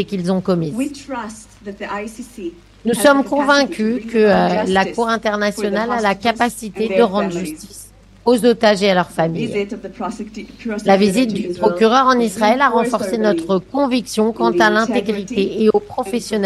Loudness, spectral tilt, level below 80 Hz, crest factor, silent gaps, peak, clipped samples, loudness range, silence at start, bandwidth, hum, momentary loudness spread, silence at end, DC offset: -17 LUFS; -5 dB/octave; -48 dBFS; 16 dB; none; 0 dBFS; under 0.1%; 3 LU; 0 s; 12.5 kHz; none; 14 LU; 0 s; under 0.1%